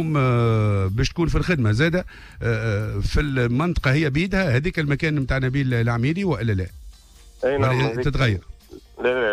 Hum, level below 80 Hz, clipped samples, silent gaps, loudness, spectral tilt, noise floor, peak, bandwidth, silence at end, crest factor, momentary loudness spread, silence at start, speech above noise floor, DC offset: none; -34 dBFS; under 0.1%; none; -22 LUFS; -7 dB/octave; -47 dBFS; -8 dBFS; 12.5 kHz; 0 s; 12 dB; 6 LU; 0 s; 26 dB; under 0.1%